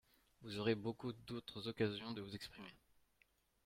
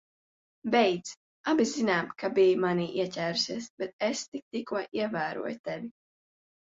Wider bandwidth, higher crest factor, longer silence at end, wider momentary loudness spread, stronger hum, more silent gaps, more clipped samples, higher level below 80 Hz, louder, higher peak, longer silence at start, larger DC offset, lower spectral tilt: first, 16 kHz vs 7.8 kHz; about the same, 22 dB vs 18 dB; about the same, 0.9 s vs 0.85 s; about the same, 15 LU vs 13 LU; neither; second, none vs 1.17-1.44 s, 3.70-3.78 s, 3.93-3.99 s, 4.28-4.32 s, 4.42-4.51 s, 5.59-5.64 s; neither; about the same, -74 dBFS vs -72 dBFS; second, -45 LUFS vs -29 LUFS; second, -24 dBFS vs -12 dBFS; second, 0.4 s vs 0.65 s; neither; first, -6 dB/octave vs -4.5 dB/octave